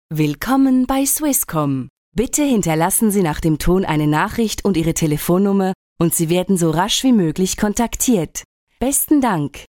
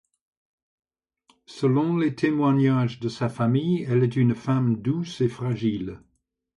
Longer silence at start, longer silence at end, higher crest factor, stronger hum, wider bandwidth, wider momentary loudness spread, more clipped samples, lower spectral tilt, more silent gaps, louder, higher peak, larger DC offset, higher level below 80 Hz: second, 0.1 s vs 1.5 s; second, 0.1 s vs 0.6 s; about the same, 14 dB vs 14 dB; neither; first, 19.5 kHz vs 10.5 kHz; about the same, 6 LU vs 7 LU; neither; second, -4.5 dB/octave vs -8.5 dB/octave; first, 1.90-2.12 s, 5.75-5.96 s, 8.45-8.67 s vs none; first, -17 LUFS vs -24 LUFS; first, -2 dBFS vs -10 dBFS; neither; first, -36 dBFS vs -60 dBFS